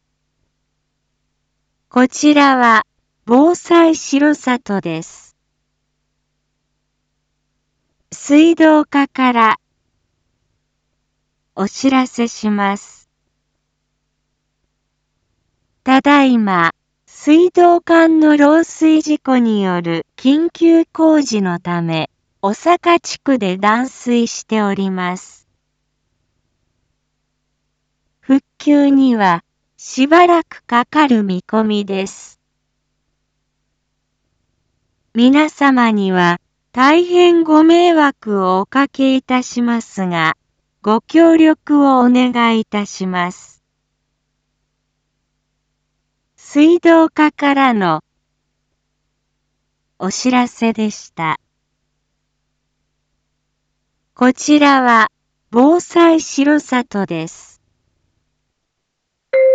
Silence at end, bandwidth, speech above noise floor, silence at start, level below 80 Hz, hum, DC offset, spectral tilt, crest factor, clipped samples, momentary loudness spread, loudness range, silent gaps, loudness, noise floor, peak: 0 s; 8 kHz; 61 dB; 1.95 s; -62 dBFS; none; under 0.1%; -5 dB/octave; 14 dB; under 0.1%; 12 LU; 11 LU; none; -13 LUFS; -73 dBFS; 0 dBFS